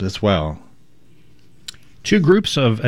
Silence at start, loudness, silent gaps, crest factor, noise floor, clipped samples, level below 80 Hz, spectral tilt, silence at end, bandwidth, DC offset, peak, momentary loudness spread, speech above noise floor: 0 s; -17 LUFS; none; 18 dB; -54 dBFS; under 0.1%; -44 dBFS; -6 dB/octave; 0 s; 13 kHz; 0.7%; -2 dBFS; 22 LU; 38 dB